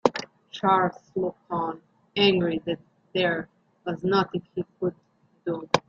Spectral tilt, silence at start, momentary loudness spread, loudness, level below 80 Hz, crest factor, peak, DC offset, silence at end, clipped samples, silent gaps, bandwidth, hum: -5.5 dB/octave; 0.05 s; 15 LU; -27 LUFS; -64 dBFS; 24 dB; -2 dBFS; under 0.1%; 0.1 s; under 0.1%; none; 7.8 kHz; none